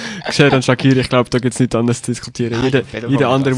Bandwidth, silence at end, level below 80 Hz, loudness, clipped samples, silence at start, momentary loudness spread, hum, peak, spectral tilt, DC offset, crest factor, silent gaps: 11.5 kHz; 0 s; -44 dBFS; -15 LUFS; under 0.1%; 0 s; 8 LU; none; 0 dBFS; -5.5 dB/octave; under 0.1%; 14 dB; none